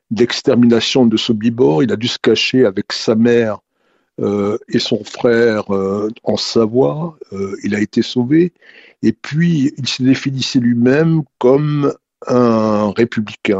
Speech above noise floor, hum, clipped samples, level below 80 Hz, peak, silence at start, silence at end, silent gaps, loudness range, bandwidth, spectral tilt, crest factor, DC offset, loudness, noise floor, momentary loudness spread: 47 dB; none; under 0.1%; -54 dBFS; 0 dBFS; 0.1 s; 0 s; none; 3 LU; 8 kHz; -6 dB/octave; 14 dB; under 0.1%; -15 LUFS; -62 dBFS; 7 LU